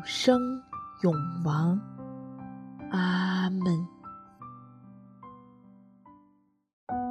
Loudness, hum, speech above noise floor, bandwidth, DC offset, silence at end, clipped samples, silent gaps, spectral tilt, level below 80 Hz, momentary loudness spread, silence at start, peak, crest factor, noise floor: -29 LUFS; none; 39 dB; 10.5 kHz; under 0.1%; 0 s; under 0.1%; 6.73-6.87 s; -6.5 dB/octave; -66 dBFS; 24 LU; 0 s; -8 dBFS; 24 dB; -66 dBFS